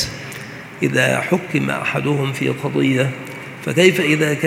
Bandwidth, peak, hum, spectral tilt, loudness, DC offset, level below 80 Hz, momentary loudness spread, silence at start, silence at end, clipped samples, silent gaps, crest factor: 16.5 kHz; 0 dBFS; none; -5 dB/octave; -18 LUFS; under 0.1%; -54 dBFS; 16 LU; 0 s; 0 s; under 0.1%; none; 18 dB